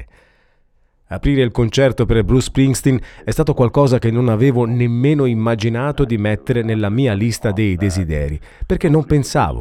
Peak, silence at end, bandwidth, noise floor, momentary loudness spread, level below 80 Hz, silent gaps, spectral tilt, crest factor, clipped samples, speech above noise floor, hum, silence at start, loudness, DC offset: -2 dBFS; 0 s; 15 kHz; -56 dBFS; 6 LU; -30 dBFS; none; -7 dB/octave; 14 dB; under 0.1%; 41 dB; none; 0 s; -16 LUFS; under 0.1%